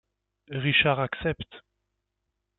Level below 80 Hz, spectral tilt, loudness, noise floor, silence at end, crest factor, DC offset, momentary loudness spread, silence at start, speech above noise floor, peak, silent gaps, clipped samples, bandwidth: -54 dBFS; -9 dB/octave; -25 LUFS; -81 dBFS; 1 s; 22 dB; under 0.1%; 16 LU; 0.5 s; 55 dB; -8 dBFS; none; under 0.1%; 4.2 kHz